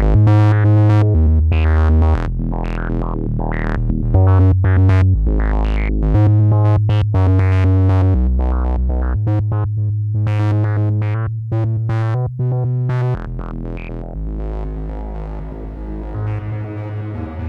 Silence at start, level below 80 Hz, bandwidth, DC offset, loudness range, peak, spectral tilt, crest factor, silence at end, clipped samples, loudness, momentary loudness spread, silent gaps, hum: 0 s; -22 dBFS; 4.7 kHz; under 0.1%; 11 LU; -2 dBFS; -10 dB/octave; 14 dB; 0 s; under 0.1%; -16 LUFS; 15 LU; none; none